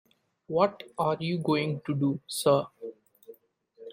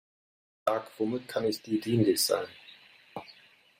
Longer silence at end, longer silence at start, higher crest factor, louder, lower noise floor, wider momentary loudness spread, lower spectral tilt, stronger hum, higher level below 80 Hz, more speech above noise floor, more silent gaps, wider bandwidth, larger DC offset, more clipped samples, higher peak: second, 0 s vs 0.5 s; second, 0.5 s vs 0.65 s; about the same, 20 dB vs 20 dB; about the same, -28 LUFS vs -29 LUFS; about the same, -60 dBFS vs -58 dBFS; second, 17 LU vs 20 LU; first, -6 dB/octave vs -4.5 dB/octave; neither; about the same, -70 dBFS vs -72 dBFS; about the same, 32 dB vs 29 dB; neither; about the same, 16.5 kHz vs 16 kHz; neither; neither; first, -8 dBFS vs -12 dBFS